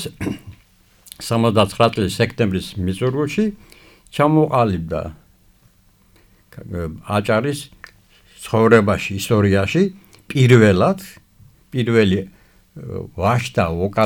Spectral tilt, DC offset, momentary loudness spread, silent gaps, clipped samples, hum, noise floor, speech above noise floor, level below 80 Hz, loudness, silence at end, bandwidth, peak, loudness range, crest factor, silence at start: -6.5 dB/octave; under 0.1%; 17 LU; none; under 0.1%; none; -54 dBFS; 37 dB; -46 dBFS; -18 LUFS; 0 s; 18 kHz; -2 dBFS; 7 LU; 18 dB; 0 s